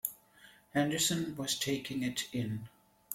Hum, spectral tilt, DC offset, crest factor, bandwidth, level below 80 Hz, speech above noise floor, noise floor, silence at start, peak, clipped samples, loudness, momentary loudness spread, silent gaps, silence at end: none; -3.5 dB/octave; under 0.1%; 22 dB; 16.5 kHz; -68 dBFS; 27 dB; -61 dBFS; 0.05 s; -14 dBFS; under 0.1%; -34 LUFS; 10 LU; none; 0 s